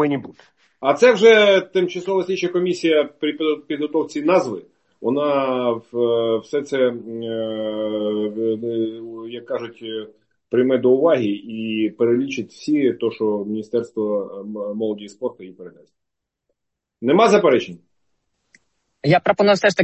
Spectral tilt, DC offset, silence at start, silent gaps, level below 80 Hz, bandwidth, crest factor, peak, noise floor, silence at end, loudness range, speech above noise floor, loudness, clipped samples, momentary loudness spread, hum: -5.5 dB/octave; under 0.1%; 0 s; none; -66 dBFS; 8.4 kHz; 18 dB; -2 dBFS; -80 dBFS; 0 s; 8 LU; 61 dB; -19 LUFS; under 0.1%; 14 LU; none